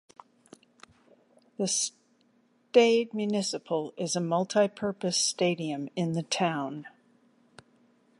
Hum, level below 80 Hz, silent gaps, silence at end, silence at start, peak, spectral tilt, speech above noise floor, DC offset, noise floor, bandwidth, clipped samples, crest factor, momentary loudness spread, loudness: none; -78 dBFS; none; 1.3 s; 1.6 s; -8 dBFS; -4 dB/octave; 39 dB; under 0.1%; -67 dBFS; 11.5 kHz; under 0.1%; 22 dB; 10 LU; -28 LUFS